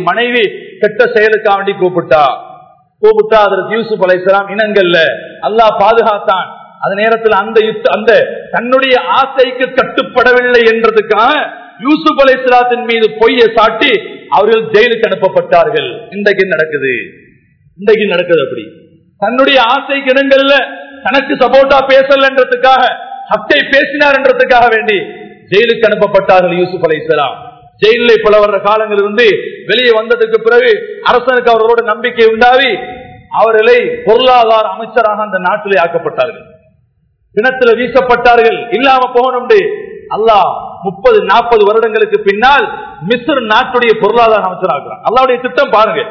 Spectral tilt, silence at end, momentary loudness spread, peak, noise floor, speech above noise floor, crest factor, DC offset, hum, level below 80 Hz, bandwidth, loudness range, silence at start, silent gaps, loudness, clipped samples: -5.5 dB/octave; 0 s; 8 LU; 0 dBFS; -55 dBFS; 46 dB; 10 dB; under 0.1%; none; -44 dBFS; 5.4 kHz; 3 LU; 0 s; none; -9 LUFS; 3%